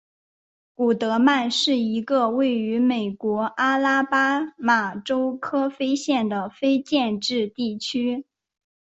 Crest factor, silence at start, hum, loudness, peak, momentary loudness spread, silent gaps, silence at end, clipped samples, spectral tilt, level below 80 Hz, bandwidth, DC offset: 16 dB; 0.8 s; none; -22 LUFS; -6 dBFS; 6 LU; none; 0.65 s; under 0.1%; -4 dB/octave; -68 dBFS; 8.2 kHz; under 0.1%